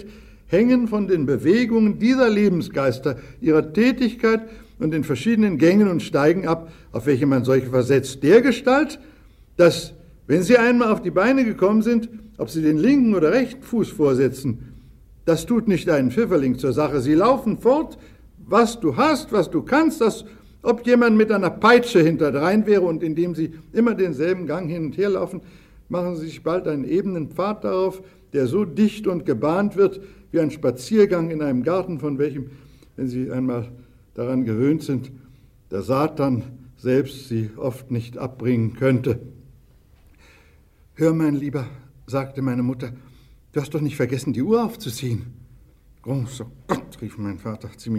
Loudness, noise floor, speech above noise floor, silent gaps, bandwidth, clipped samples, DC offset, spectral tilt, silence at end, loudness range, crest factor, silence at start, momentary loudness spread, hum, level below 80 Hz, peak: -20 LUFS; -53 dBFS; 33 dB; none; 15 kHz; under 0.1%; under 0.1%; -7 dB/octave; 0 s; 8 LU; 18 dB; 0 s; 13 LU; none; -50 dBFS; -2 dBFS